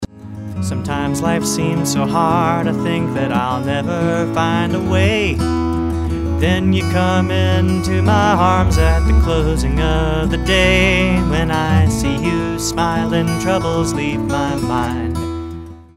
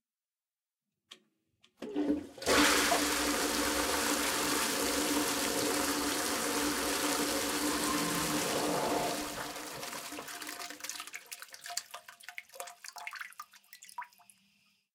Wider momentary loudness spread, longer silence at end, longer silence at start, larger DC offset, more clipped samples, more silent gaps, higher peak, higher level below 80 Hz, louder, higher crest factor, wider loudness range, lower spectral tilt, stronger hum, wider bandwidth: second, 7 LU vs 17 LU; second, 0.15 s vs 0.9 s; second, 0 s vs 1.1 s; neither; neither; neither; first, 0 dBFS vs -16 dBFS; first, -24 dBFS vs -60 dBFS; first, -16 LUFS vs -31 LUFS; about the same, 14 dB vs 18 dB; second, 3 LU vs 14 LU; first, -5.5 dB/octave vs -1.5 dB/octave; neither; second, 15.5 kHz vs 18 kHz